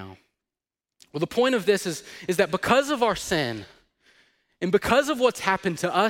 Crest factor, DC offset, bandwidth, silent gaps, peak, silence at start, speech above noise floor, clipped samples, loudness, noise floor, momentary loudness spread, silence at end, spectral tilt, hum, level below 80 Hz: 20 dB; under 0.1%; 17 kHz; none; -6 dBFS; 0 s; over 67 dB; under 0.1%; -24 LUFS; under -90 dBFS; 11 LU; 0 s; -4 dB/octave; none; -54 dBFS